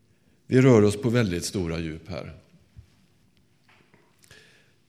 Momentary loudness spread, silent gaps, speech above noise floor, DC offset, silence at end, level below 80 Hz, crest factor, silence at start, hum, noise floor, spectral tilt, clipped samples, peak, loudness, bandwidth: 20 LU; none; 41 dB; under 0.1%; 2.55 s; -52 dBFS; 22 dB; 0.5 s; none; -64 dBFS; -6.5 dB/octave; under 0.1%; -4 dBFS; -22 LUFS; 14.5 kHz